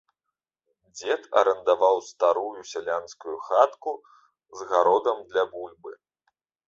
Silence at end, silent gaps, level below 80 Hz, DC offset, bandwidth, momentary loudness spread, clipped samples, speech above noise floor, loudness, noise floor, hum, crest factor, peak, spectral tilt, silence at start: 0.75 s; none; -72 dBFS; under 0.1%; 7.6 kHz; 18 LU; under 0.1%; 62 dB; -24 LUFS; -86 dBFS; none; 22 dB; -4 dBFS; -2.5 dB/octave; 0.95 s